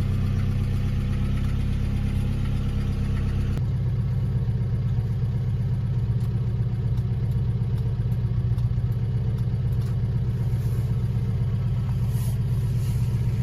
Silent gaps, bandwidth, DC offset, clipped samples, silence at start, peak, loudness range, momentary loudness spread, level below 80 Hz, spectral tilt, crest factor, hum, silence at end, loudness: none; 12.5 kHz; under 0.1%; under 0.1%; 0 s; -12 dBFS; 1 LU; 1 LU; -30 dBFS; -8.5 dB/octave; 10 dB; none; 0 s; -26 LUFS